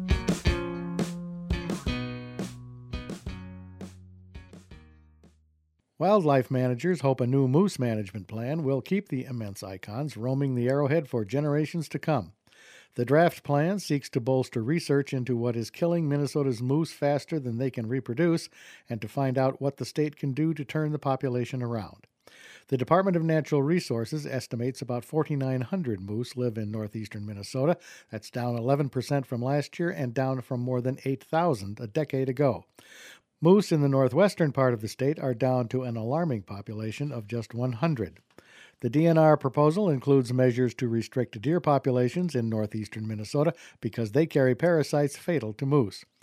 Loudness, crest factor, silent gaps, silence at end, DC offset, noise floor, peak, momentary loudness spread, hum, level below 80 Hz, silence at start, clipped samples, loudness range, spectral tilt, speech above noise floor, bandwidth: -28 LUFS; 20 dB; none; 0.2 s; under 0.1%; -70 dBFS; -6 dBFS; 13 LU; none; -48 dBFS; 0 s; under 0.1%; 6 LU; -7.5 dB/octave; 44 dB; 15 kHz